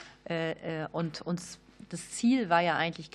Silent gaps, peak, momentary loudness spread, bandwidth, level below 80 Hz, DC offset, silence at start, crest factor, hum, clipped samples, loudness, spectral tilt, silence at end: none; -10 dBFS; 17 LU; 12.5 kHz; -66 dBFS; under 0.1%; 0 s; 20 dB; none; under 0.1%; -31 LUFS; -5 dB/octave; 0.05 s